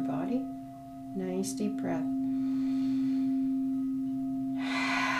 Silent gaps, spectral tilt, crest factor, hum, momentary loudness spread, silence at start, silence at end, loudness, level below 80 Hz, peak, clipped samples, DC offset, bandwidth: none; -5 dB/octave; 16 dB; none; 9 LU; 0 s; 0 s; -32 LUFS; -62 dBFS; -16 dBFS; under 0.1%; under 0.1%; 13 kHz